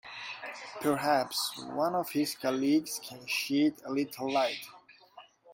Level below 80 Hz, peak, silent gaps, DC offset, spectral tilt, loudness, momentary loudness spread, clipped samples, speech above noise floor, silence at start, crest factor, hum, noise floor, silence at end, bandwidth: -76 dBFS; -14 dBFS; none; under 0.1%; -3.5 dB/octave; -31 LUFS; 12 LU; under 0.1%; 25 dB; 0.05 s; 18 dB; none; -56 dBFS; 0 s; 16.5 kHz